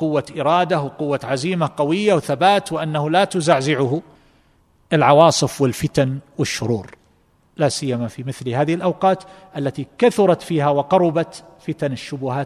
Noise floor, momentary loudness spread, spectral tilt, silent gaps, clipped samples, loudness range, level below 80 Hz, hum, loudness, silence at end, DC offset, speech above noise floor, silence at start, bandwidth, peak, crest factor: -58 dBFS; 10 LU; -5.5 dB/octave; none; under 0.1%; 5 LU; -56 dBFS; none; -19 LUFS; 0 s; under 0.1%; 39 dB; 0 s; 14 kHz; 0 dBFS; 18 dB